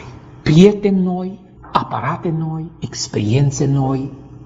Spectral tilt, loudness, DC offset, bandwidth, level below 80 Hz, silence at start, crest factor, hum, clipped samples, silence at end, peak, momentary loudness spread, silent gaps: -6.5 dB/octave; -17 LUFS; under 0.1%; 8 kHz; -44 dBFS; 0 s; 16 dB; none; 0.1%; 0 s; 0 dBFS; 17 LU; none